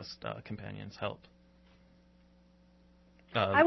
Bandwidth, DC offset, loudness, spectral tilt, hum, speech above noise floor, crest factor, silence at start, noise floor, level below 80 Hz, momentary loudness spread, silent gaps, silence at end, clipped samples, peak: 6 kHz; under 0.1%; -37 LUFS; -3.5 dB/octave; none; 31 dB; 22 dB; 0 s; -63 dBFS; -66 dBFS; 13 LU; none; 0 s; under 0.1%; -12 dBFS